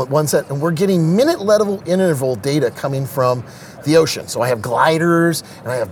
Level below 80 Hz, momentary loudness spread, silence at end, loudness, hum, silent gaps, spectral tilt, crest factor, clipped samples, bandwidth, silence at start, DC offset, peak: -58 dBFS; 9 LU; 0 s; -17 LUFS; none; none; -5.5 dB/octave; 16 dB; under 0.1%; 19 kHz; 0 s; under 0.1%; 0 dBFS